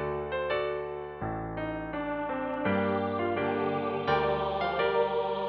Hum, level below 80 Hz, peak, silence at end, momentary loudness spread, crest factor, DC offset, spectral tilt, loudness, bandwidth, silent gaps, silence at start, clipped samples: none; -52 dBFS; -14 dBFS; 0 s; 7 LU; 16 dB; under 0.1%; -8.5 dB/octave; -30 LUFS; 6 kHz; none; 0 s; under 0.1%